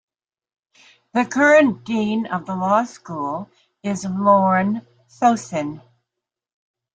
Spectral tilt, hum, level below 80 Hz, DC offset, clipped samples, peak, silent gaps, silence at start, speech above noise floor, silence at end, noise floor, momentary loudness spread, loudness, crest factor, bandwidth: -6 dB/octave; none; -64 dBFS; under 0.1%; under 0.1%; -2 dBFS; none; 1.15 s; 65 dB; 1.15 s; -84 dBFS; 15 LU; -19 LUFS; 18 dB; 9.2 kHz